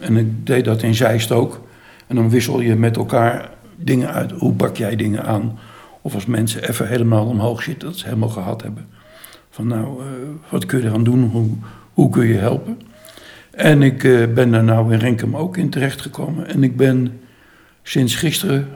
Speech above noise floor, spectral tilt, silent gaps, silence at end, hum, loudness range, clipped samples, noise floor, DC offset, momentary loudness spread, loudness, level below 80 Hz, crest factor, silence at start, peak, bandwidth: 33 dB; -6.5 dB/octave; none; 0 s; none; 6 LU; under 0.1%; -49 dBFS; under 0.1%; 13 LU; -17 LUFS; -52 dBFS; 16 dB; 0 s; -2 dBFS; 18.5 kHz